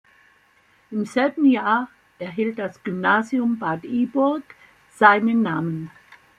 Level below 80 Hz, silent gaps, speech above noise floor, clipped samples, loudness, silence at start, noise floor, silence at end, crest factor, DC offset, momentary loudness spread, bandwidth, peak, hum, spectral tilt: -66 dBFS; none; 38 dB; under 0.1%; -21 LUFS; 0.9 s; -59 dBFS; 0.5 s; 20 dB; under 0.1%; 15 LU; 10 kHz; -2 dBFS; none; -6.5 dB/octave